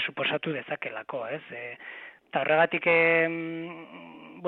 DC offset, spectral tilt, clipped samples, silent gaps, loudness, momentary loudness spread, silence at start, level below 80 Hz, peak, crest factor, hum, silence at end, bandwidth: under 0.1%; -8 dB/octave; under 0.1%; none; -26 LUFS; 22 LU; 0 s; -74 dBFS; -10 dBFS; 18 dB; none; 0 s; 4.5 kHz